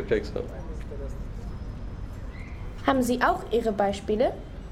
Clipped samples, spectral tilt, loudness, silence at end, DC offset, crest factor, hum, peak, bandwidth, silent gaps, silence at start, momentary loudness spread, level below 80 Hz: under 0.1%; -6 dB/octave; -28 LUFS; 0 s; under 0.1%; 20 dB; none; -8 dBFS; 16.5 kHz; none; 0 s; 15 LU; -38 dBFS